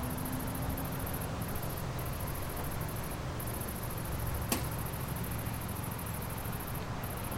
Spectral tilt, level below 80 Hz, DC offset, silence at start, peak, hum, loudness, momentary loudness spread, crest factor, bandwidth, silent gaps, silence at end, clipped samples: -5 dB/octave; -44 dBFS; under 0.1%; 0 s; -14 dBFS; none; -37 LUFS; 3 LU; 24 dB; 17 kHz; none; 0 s; under 0.1%